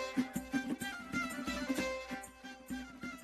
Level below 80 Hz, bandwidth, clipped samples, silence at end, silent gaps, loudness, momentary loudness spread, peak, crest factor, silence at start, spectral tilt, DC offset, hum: -60 dBFS; 14.5 kHz; under 0.1%; 0 s; none; -40 LUFS; 9 LU; -22 dBFS; 18 dB; 0 s; -4 dB/octave; under 0.1%; none